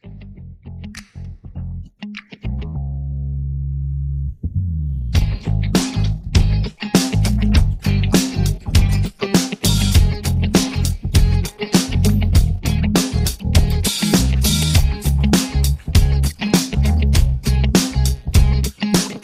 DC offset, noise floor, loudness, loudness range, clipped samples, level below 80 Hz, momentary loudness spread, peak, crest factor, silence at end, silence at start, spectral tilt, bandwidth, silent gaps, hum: under 0.1%; -36 dBFS; -18 LUFS; 9 LU; under 0.1%; -20 dBFS; 15 LU; 0 dBFS; 16 dB; 0.05 s; 0.05 s; -5 dB/octave; 16 kHz; none; none